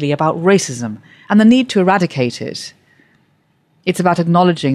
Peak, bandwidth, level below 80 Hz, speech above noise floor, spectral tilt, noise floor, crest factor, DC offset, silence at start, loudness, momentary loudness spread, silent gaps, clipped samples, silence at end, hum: -2 dBFS; 13 kHz; -58 dBFS; 45 dB; -6 dB/octave; -59 dBFS; 14 dB; under 0.1%; 0 s; -14 LUFS; 16 LU; none; under 0.1%; 0 s; none